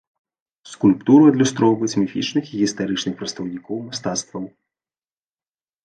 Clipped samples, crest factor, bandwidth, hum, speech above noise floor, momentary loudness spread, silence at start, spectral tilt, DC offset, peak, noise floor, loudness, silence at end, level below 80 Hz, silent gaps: under 0.1%; 18 dB; 9.2 kHz; none; over 71 dB; 17 LU; 0.65 s; -5 dB/octave; under 0.1%; -2 dBFS; under -90 dBFS; -19 LUFS; 1.35 s; -60 dBFS; none